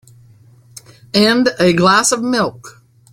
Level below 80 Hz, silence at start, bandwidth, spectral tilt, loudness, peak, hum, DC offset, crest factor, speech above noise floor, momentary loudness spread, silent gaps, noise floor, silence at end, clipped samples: -52 dBFS; 1.15 s; 16.5 kHz; -3.5 dB/octave; -13 LUFS; 0 dBFS; none; under 0.1%; 16 dB; 32 dB; 8 LU; none; -46 dBFS; 0.4 s; under 0.1%